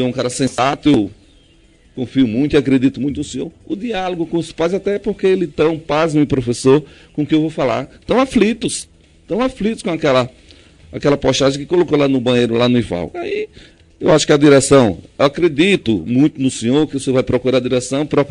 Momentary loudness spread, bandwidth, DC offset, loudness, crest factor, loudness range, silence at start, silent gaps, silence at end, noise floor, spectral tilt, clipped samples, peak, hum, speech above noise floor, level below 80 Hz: 10 LU; 11 kHz; under 0.1%; -16 LUFS; 16 dB; 5 LU; 0 s; none; 0 s; -49 dBFS; -5.5 dB/octave; under 0.1%; 0 dBFS; none; 34 dB; -42 dBFS